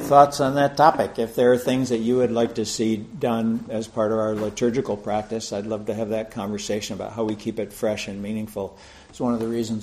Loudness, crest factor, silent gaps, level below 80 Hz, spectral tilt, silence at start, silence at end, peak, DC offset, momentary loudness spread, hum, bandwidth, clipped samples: -23 LUFS; 22 dB; none; -54 dBFS; -5.5 dB/octave; 0 s; 0 s; -2 dBFS; under 0.1%; 11 LU; none; 15 kHz; under 0.1%